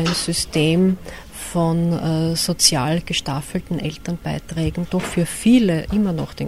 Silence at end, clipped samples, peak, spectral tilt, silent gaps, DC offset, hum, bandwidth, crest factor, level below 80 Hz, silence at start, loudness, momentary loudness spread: 0 s; under 0.1%; -2 dBFS; -4.5 dB/octave; none; under 0.1%; none; 15.5 kHz; 18 dB; -40 dBFS; 0 s; -20 LUFS; 11 LU